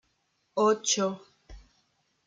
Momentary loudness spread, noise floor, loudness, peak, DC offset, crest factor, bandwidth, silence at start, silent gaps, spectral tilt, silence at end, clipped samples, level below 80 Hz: 13 LU; -74 dBFS; -27 LUFS; -12 dBFS; under 0.1%; 18 dB; 9.6 kHz; 0.55 s; none; -3 dB/octave; 0.7 s; under 0.1%; -58 dBFS